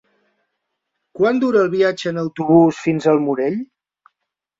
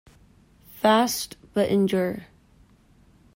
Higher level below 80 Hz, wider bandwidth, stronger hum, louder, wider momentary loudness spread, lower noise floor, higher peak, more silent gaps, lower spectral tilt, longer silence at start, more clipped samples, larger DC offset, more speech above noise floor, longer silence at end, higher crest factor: about the same, -62 dBFS vs -58 dBFS; second, 7.8 kHz vs 16.5 kHz; neither; first, -17 LUFS vs -23 LUFS; about the same, 10 LU vs 10 LU; first, -78 dBFS vs -57 dBFS; first, -2 dBFS vs -8 dBFS; neither; first, -7 dB/octave vs -4.5 dB/octave; first, 1.15 s vs 0.75 s; neither; neither; first, 62 dB vs 35 dB; second, 0.95 s vs 1.1 s; about the same, 16 dB vs 18 dB